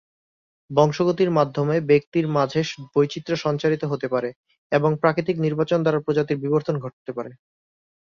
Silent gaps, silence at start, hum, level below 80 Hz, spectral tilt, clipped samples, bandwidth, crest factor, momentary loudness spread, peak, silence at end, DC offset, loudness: 2.07-2.12 s, 4.36-4.44 s, 4.58-4.70 s, 6.93-7.05 s; 0.7 s; none; -62 dBFS; -7 dB/octave; under 0.1%; 7.2 kHz; 20 dB; 9 LU; -2 dBFS; 0.65 s; under 0.1%; -22 LUFS